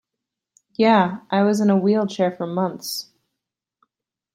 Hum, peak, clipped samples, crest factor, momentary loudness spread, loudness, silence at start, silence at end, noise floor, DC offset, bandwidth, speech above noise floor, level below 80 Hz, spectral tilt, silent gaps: none; -2 dBFS; under 0.1%; 18 dB; 12 LU; -20 LUFS; 0.8 s; 1.3 s; -84 dBFS; under 0.1%; 16 kHz; 65 dB; -68 dBFS; -6 dB/octave; none